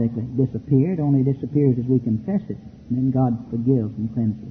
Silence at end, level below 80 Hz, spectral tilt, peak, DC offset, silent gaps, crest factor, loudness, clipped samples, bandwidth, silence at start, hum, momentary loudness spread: 0 s; -50 dBFS; -12.5 dB/octave; -6 dBFS; under 0.1%; none; 14 dB; -22 LUFS; under 0.1%; 2.7 kHz; 0 s; none; 7 LU